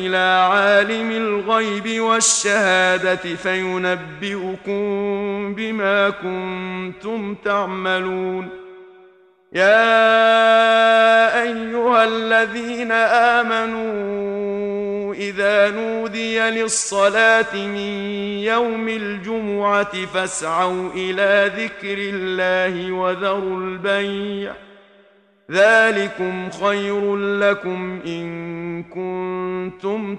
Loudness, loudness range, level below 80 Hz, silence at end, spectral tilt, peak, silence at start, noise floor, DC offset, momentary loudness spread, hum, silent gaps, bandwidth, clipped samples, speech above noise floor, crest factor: -18 LUFS; 8 LU; -58 dBFS; 0 s; -3 dB/octave; -2 dBFS; 0 s; -54 dBFS; under 0.1%; 13 LU; none; none; 11 kHz; under 0.1%; 35 dB; 18 dB